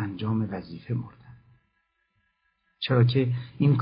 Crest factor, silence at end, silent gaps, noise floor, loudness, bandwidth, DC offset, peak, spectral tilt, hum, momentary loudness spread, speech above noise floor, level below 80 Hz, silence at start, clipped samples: 18 dB; 0 s; none; -74 dBFS; -27 LUFS; 5.2 kHz; under 0.1%; -8 dBFS; -11.5 dB/octave; none; 13 LU; 49 dB; -58 dBFS; 0 s; under 0.1%